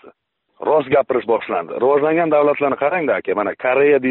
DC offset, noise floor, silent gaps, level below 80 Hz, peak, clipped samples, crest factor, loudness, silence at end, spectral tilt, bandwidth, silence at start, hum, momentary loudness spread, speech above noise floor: under 0.1%; -60 dBFS; none; -60 dBFS; -4 dBFS; under 0.1%; 12 dB; -17 LUFS; 0 s; -4.5 dB/octave; 4.1 kHz; 0.05 s; none; 5 LU; 44 dB